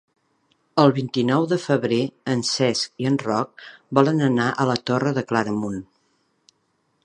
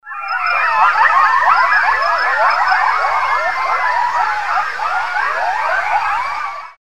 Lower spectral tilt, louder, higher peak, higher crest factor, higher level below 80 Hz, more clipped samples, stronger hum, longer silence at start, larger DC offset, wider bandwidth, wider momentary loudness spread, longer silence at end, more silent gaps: first, -5.5 dB/octave vs -0.5 dB/octave; second, -22 LUFS vs -14 LUFS; about the same, 0 dBFS vs 0 dBFS; first, 22 dB vs 16 dB; second, -64 dBFS vs -54 dBFS; neither; neither; first, 0.75 s vs 0 s; second, under 0.1% vs 2%; second, 10.5 kHz vs 15 kHz; about the same, 7 LU vs 7 LU; first, 1.2 s vs 0.1 s; neither